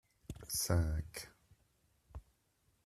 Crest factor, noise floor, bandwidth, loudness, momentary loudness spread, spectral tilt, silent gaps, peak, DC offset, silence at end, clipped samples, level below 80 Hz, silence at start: 24 dB; -77 dBFS; 14.5 kHz; -38 LUFS; 23 LU; -4.5 dB/octave; none; -18 dBFS; under 0.1%; 0.65 s; under 0.1%; -52 dBFS; 0.3 s